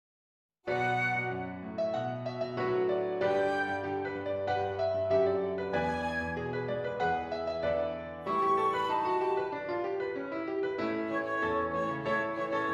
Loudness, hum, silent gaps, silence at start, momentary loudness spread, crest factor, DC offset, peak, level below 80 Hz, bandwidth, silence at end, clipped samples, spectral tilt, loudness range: -32 LUFS; none; none; 0.65 s; 7 LU; 16 dB; under 0.1%; -16 dBFS; -64 dBFS; 10.5 kHz; 0 s; under 0.1%; -6.5 dB/octave; 2 LU